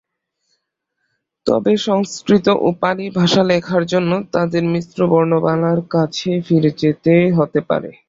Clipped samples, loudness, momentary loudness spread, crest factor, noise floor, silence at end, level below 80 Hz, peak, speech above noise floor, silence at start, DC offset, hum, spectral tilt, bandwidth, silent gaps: under 0.1%; -16 LUFS; 6 LU; 16 dB; -73 dBFS; 0.2 s; -54 dBFS; -2 dBFS; 57 dB; 1.45 s; under 0.1%; none; -6.5 dB/octave; 7.8 kHz; none